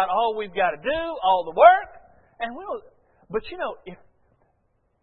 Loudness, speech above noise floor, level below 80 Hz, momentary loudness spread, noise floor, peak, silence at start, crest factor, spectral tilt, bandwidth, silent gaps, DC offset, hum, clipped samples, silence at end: -22 LUFS; 47 dB; -54 dBFS; 20 LU; -68 dBFS; -2 dBFS; 0 s; 22 dB; -8 dB/octave; 4.3 kHz; none; under 0.1%; none; under 0.1%; 1.1 s